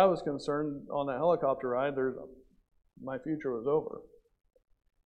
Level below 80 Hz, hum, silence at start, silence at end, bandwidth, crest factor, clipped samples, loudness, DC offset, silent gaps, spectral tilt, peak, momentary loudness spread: -66 dBFS; none; 0 s; 1.05 s; 9 kHz; 20 dB; under 0.1%; -32 LUFS; under 0.1%; none; -7.5 dB/octave; -12 dBFS; 17 LU